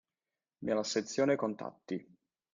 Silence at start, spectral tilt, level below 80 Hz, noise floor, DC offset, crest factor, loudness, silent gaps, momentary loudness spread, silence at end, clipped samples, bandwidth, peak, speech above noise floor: 0.6 s; -4.5 dB/octave; -76 dBFS; under -90 dBFS; under 0.1%; 18 dB; -35 LUFS; none; 12 LU; 0.5 s; under 0.1%; 9.6 kHz; -18 dBFS; over 56 dB